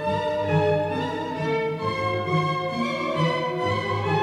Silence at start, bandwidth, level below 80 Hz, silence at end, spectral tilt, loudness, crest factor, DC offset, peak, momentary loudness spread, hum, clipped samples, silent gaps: 0 s; 11.5 kHz; -58 dBFS; 0 s; -6.5 dB/octave; -25 LUFS; 14 dB; under 0.1%; -10 dBFS; 4 LU; none; under 0.1%; none